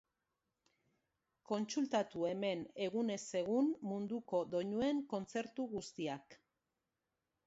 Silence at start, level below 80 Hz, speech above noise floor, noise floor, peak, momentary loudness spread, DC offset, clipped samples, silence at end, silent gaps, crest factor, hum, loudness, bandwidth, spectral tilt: 1.5 s; -78 dBFS; 51 dB; -89 dBFS; -24 dBFS; 7 LU; under 0.1%; under 0.1%; 1.1 s; none; 16 dB; none; -39 LUFS; 7.6 kHz; -5 dB/octave